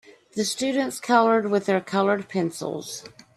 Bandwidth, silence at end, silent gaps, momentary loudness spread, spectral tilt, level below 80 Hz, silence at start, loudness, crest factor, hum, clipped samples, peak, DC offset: 13.5 kHz; 0.25 s; none; 14 LU; -4.5 dB/octave; -70 dBFS; 0.35 s; -23 LUFS; 20 dB; none; under 0.1%; -4 dBFS; under 0.1%